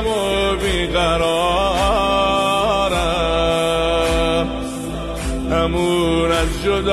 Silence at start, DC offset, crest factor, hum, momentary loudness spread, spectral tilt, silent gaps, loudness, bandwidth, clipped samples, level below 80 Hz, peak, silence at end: 0 s; under 0.1%; 12 dB; none; 7 LU; -4.5 dB/octave; none; -18 LUFS; 13.5 kHz; under 0.1%; -28 dBFS; -6 dBFS; 0 s